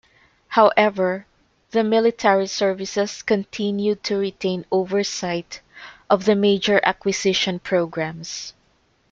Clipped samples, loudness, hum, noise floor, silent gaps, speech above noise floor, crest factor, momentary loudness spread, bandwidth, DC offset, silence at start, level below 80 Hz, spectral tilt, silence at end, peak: under 0.1%; -21 LUFS; none; -62 dBFS; none; 42 dB; 20 dB; 13 LU; 7.6 kHz; under 0.1%; 0.5 s; -60 dBFS; -4.5 dB/octave; 0.6 s; -2 dBFS